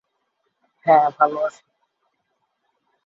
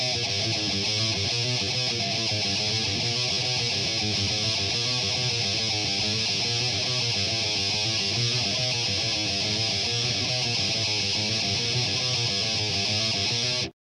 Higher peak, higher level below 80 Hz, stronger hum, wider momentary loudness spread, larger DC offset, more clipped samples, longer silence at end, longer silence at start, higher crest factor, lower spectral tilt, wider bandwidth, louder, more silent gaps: first, -2 dBFS vs -12 dBFS; second, -74 dBFS vs -56 dBFS; neither; first, 12 LU vs 1 LU; neither; neither; first, 1.55 s vs 0.15 s; first, 0.85 s vs 0 s; first, 20 dB vs 14 dB; first, -6.5 dB/octave vs -2.5 dB/octave; second, 7.6 kHz vs 12 kHz; first, -19 LUFS vs -23 LUFS; neither